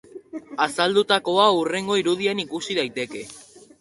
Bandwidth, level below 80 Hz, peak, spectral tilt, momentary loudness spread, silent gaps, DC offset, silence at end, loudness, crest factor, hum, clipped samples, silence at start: 11.5 kHz; -66 dBFS; -2 dBFS; -3.5 dB/octave; 18 LU; none; under 0.1%; 0.4 s; -22 LUFS; 20 dB; none; under 0.1%; 0.15 s